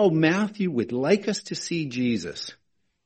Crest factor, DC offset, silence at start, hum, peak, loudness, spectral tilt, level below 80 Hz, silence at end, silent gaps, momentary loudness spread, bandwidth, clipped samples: 20 dB; under 0.1%; 0 s; none; -6 dBFS; -25 LUFS; -5.5 dB/octave; -64 dBFS; 0.5 s; none; 10 LU; 8.8 kHz; under 0.1%